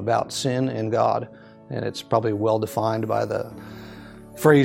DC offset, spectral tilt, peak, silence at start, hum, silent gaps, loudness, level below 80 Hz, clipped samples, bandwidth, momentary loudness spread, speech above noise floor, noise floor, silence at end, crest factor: under 0.1%; -6 dB/octave; -2 dBFS; 0 s; none; none; -24 LUFS; -58 dBFS; under 0.1%; 16.5 kHz; 18 LU; 19 dB; -41 dBFS; 0 s; 22 dB